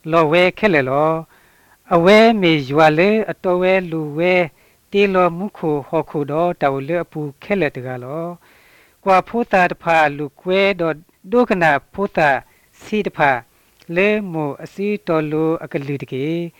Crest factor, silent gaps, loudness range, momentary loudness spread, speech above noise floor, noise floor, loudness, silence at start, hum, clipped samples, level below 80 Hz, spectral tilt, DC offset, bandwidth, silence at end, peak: 16 dB; none; 6 LU; 12 LU; 36 dB; -53 dBFS; -17 LUFS; 0.05 s; none; under 0.1%; -52 dBFS; -6.5 dB/octave; under 0.1%; 17.5 kHz; 0.1 s; 0 dBFS